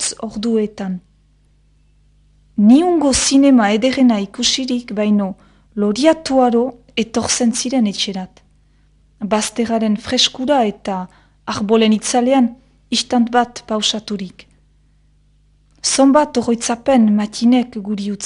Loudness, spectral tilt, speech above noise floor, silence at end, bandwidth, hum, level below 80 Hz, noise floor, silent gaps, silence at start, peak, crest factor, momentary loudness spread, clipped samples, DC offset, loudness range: -16 LUFS; -4 dB/octave; 39 dB; 0 s; 11 kHz; 50 Hz at -45 dBFS; -48 dBFS; -54 dBFS; none; 0 s; 0 dBFS; 16 dB; 14 LU; under 0.1%; under 0.1%; 5 LU